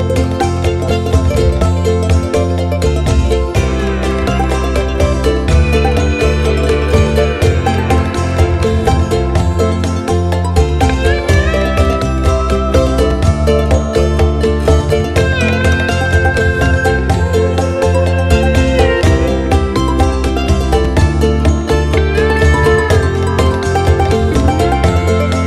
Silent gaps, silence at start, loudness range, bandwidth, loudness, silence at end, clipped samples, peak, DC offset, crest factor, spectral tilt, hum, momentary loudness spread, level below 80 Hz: none; 0 s; 2 LU; 13 kHz; -13 LUFS; 0 s; under 0.1%; 0 dBFS; under 0.1%; 12 dB; -6.5 dB/octave; none; 3 LU; -18 dBFS